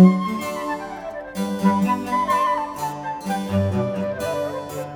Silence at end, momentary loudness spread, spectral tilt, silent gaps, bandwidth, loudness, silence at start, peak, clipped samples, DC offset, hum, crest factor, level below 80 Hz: 0 s; 10 LU; -7 dB/octave; none; 19 kHz; -23 LUFS; 0 s; -2 dBFS; under 0.1%; under 0.1%; none; 20 dB; -54 dBFS